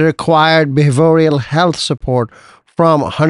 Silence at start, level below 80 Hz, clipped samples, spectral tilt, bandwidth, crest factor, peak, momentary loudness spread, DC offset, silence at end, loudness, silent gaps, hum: 0 s; -40 dBFS; under 0.1%; -6 dB/octave; 11.5 kHz; 12 dB; 0 dBFS; 8 LU; under 0.1%; 0 s; -12 LUFS; none; none